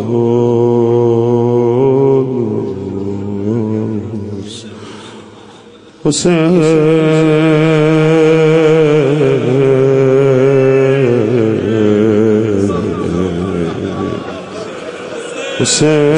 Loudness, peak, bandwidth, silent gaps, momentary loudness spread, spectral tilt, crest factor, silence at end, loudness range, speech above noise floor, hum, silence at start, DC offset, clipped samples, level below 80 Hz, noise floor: -12 LUFS; 0 dBFS; 10.5 kHz; none; 15 LU; -6 dB/octave; 12 dB; 0 s; 8 LU; 28 dB; none; 0 s; under 0.1%; under 0.1%; -48 dBFS; -37 dBFS